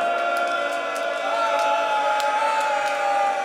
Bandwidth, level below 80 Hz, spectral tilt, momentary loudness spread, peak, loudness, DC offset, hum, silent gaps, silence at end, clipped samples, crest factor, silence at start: 16 kHz; under -90 dBFS; -1 dB/octave; 4 LU; -6 dBFS; -22 LUFS; under 0.1%; none; none; 0 s; under 0.1%; 16 dB; 0 s